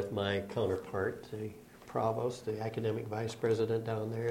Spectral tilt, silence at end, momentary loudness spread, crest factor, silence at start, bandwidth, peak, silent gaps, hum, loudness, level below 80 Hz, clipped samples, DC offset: -6.5 dB/octave; 0 s; 10 LU; 16 dB; 0 s; 16.5 kHz; -18 dBFS; none; none; -35 LUFS; -66 dBFS; under 0.1%; under 0.1%